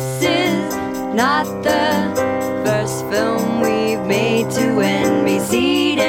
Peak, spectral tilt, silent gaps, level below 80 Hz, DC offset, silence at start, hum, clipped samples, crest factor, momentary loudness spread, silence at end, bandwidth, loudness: -2 dBFS; -4.5 dB/octave; none; -50 dBFS; under 0.1%; 0 s; none; under 0.1%; 16 dB; 4 LU; 0 s; 17.5 kHz; -17 LUFS